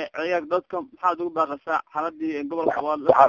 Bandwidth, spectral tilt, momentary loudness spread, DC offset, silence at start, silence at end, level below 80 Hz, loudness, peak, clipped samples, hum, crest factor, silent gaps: 7.2 kHz; -6.5 dB/octave; 4 LU; under 0.1%; 0 s; 0 s; -66 dBFS; -25 LUFS; 0 dBFS; under 0.1%; none; 22 dB; none